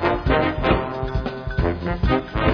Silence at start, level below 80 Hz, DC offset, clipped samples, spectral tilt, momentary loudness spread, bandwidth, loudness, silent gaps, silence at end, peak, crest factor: 0 s; -28 dBFS; under 0.1%; under 0.1%; -8.5 dB/octave; 7 LU; 5.4 kHz; -22 LUFS; none; 0 s; -4 dBFS; 16 dB